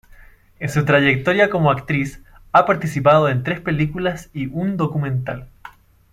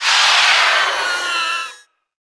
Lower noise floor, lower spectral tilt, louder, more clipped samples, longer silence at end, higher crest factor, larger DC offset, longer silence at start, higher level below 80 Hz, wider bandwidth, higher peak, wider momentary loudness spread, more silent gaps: first, -46 dBFS vs -41 dBFS; first, -7 dB/octave vs 3 dB/octave; second, -18 LUFS vs -14 LUFS; neither; about the same, 0.45 s vs 0.45 s; about the same, 18 dB vs 14 dB; neither; first, 0.6 s vs 0 s; first, -46 dBFS vs -62 dBFS; first, 13.5 kHz vs 11 kHz; about the same, -2 dBFS vs -2 dBFS; about the same, 12 LU vs 11 LU; neither